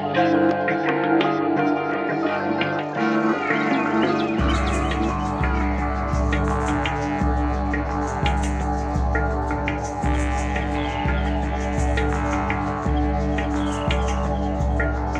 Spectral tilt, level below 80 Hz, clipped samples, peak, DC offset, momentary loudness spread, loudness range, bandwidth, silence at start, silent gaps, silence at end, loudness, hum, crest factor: -6.5 dB/octave; -28 dBFS; under 0.1%; -6 dBFS; under 0.1%; 4 LU; 2 LU; 9.4 kHz; 0 s; none; 0 s; -23 LUFS; none; 16 dB